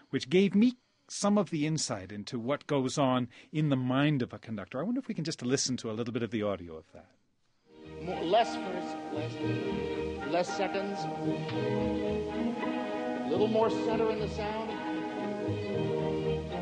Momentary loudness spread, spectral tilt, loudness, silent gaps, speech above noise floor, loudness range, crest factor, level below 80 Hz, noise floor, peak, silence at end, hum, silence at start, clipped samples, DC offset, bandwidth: 9 LU; -5.5 dB/octave; -32 LUFS; none; 40 dB; 4 LU; 18 dB; -56 dBFS; -71 dBFS; -14 dBFS; 0 s; none; 0.15 s; under 0.1%; under 0.1%; 10 kHz